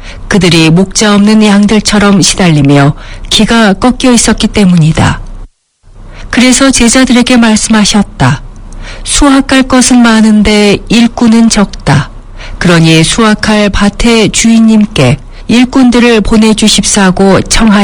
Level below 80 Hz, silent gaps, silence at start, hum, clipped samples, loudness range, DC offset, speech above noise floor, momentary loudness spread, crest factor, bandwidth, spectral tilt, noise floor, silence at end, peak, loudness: -22 dBFS; none; 0 s; none; 5%; 2 LU; under 0.1%; 34 dB; 6 LU; 6 dB; 18 kHz; -4.5 dB/octave; -39 dBFS; 0 s; 0 dBFS; -5 LUFS